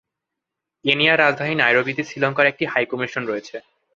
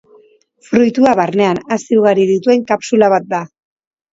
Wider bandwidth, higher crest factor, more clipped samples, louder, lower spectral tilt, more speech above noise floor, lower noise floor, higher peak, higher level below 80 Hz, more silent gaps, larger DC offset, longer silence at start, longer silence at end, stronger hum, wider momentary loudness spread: about the same, 7.6 kHz vs 7.8 kHz; first, 20 dB vs 14 dB; neither; second, -19 LUFS vs -13 LUFS; about the same, -5 dB/octave vs -6 dB/octave; first, 63 dB vs 36 dB; first, -83 dBFS vs -49 dBFS; about the same, 0 dBFS vs 0 dBFS; second, -66 dBFS vs -56 dBFS; neither; neither; first, 0.85 s vs 0.7 s; second, 0.35 s vs 0.7 s; neither; first, 12 LU vs 8 LU